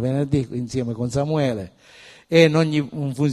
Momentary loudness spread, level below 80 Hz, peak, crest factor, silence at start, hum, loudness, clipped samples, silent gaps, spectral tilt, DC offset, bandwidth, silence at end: 11 LU; -48 dBFS; 0 dBFS; 20 dB; 0 s; none; -21 LUFS; under 0.1%; none; -6.5 dB/octave; under 0.1%; 12.5 kHz; 0 s